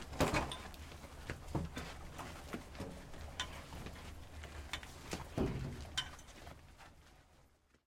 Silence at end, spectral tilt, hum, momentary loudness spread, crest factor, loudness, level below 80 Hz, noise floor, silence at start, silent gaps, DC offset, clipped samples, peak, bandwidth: 0.4 s; -4.5 dB/octave; none; 16 LU; 26 dB; -44 LUFS; -52 dBFS; -69 dBFS; 0 s; none; under 0.1%; under 0.1%; -18 dBFS; 16.5 kHz